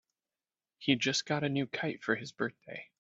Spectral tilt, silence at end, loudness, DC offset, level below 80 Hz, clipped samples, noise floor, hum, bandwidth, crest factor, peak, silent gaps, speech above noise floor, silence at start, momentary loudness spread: -4 dB/octave; 0.15 s; -33 LUFS; under 0.1%; -76 dBFS; under 0.1%; under -90 dBFS; none; 8 kHz; 24 dB; -10 dBFS; none; over 56 dB; 0.8 s; 9 LU